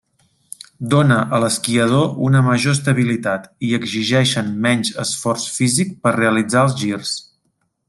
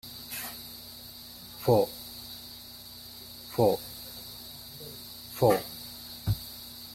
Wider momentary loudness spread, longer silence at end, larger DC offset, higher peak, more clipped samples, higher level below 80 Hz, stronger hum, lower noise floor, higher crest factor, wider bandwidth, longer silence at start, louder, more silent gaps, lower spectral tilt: second, 8 LU vs 18 LU; first, 0.65 s vs 0 s; neither; first, 0 dBFS vs -8 dBFS; neither; about the same, -58 dBFS vs -54 dBFS; neither; first, -68 dBFS vs -46 dBFS; second, 18 dB vs 24 dB; second, 12.5 kHz vs 16.5 kHz; first, 0.8 s vs 0.05 s; first, -17 LUFS vs -32 LUFS; neither; about the same, -5 dB/octave vs -5.5 dB/octave